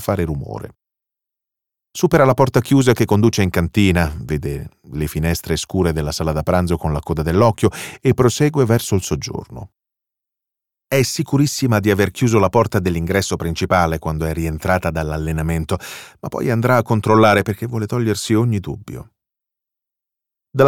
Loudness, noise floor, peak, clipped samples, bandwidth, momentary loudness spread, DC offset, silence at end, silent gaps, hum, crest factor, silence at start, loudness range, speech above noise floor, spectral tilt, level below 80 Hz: -18 LUFS; -85 dBFS; -2 dBFS; under 0.1%; 17.5 kHz; 13 LU; under 0.1%; 0 s; none; none; 16 dB; 0 s; 4 LU; 67 dB; -6 dB/octave; -36 dBFS